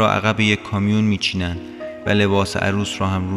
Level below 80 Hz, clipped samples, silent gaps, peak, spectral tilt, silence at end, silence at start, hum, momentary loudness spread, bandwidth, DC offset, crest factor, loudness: -46 dBFS; under 0.1%; none; -2 dBFS; -5.5 dB/octave; 0 s; 0 s; none; 10 LU; 13 kHz; under 0.1%; 18 dB; -19 LUFS